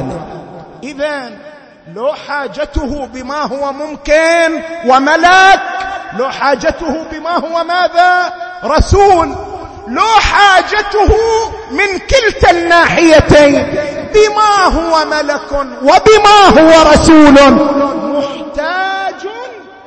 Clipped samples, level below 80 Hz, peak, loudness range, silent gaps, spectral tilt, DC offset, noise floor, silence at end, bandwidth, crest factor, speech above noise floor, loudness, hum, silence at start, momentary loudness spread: 0.7%; -26 dBFS; 0 dBFS; 9 LU; none; -4.5 dB/octave; under 0.1%; -29 dBFS; 0.15 s; 11 kHz; 10 dB; 21 dB; -9 LUFS; none; 0 s; 16 LU